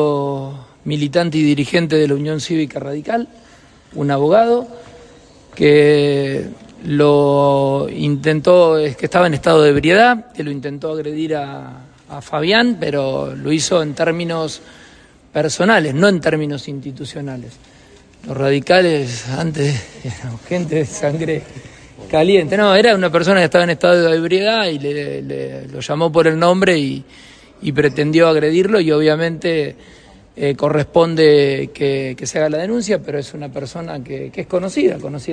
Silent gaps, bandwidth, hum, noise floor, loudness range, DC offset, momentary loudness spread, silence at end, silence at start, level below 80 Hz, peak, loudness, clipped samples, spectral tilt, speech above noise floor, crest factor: none; 10.5 kHz; none; -45 dBFS; 5 LU; under 0.1%; 16 LU; 0 s; 0 s; -50 dBFS; 0 dBFS; -15 LUFS; under 0.1%; -5.5 dB/octave; 30 dB; 16 dB